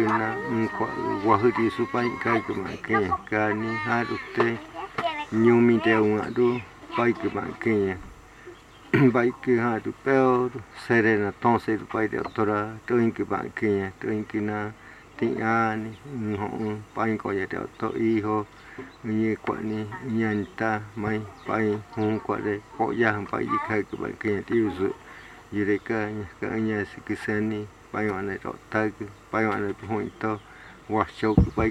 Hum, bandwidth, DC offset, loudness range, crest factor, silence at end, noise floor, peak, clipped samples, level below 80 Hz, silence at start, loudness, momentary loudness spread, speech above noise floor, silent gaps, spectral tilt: none; 11 kHz; under 0.1%; 5 LU; 22 dB; 0 s; -46 dBFS; -4 dBFS; under 0.1%; -48 dBFS; 0 s; -26 LUFS; 11 LU; 21 dB; none; -7.5 dB/octave